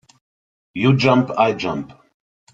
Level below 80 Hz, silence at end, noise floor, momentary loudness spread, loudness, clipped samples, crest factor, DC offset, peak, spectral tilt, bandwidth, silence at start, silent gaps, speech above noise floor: -56 dBFS; 0.6 s; under -90 dBFS; 17 LU; -18 LUFS; under 0.1%; 18 dB; under 0.1%; -2 dBFS; -7 dB/octave; 7.8 kHz; 0.75 s; none; over 73 dB